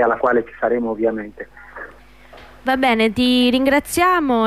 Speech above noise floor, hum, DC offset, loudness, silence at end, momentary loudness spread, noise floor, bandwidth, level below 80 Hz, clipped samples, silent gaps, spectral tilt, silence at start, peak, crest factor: 27 dB; none; 0.3%; -17 LUFS; 0 s; 20 LU; -44 dBFS; 15.5 kHz; -46 dBFS; under 0.1%; none; -4 dB/octave; 0 s; -6 dBFS; 12 dB